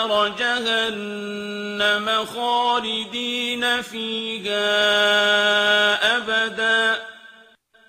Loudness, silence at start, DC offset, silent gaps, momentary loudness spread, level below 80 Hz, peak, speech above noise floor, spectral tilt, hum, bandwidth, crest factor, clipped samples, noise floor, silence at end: -20 LUFS; 0 s; under 0.1%; none; 11 LU; -66 dBFS; -6 dBFS; 32 dB; -2 dB/octave; none; 15.5 kHz; 16 dB; under 0.1%; -53 dBFS; 0.6 s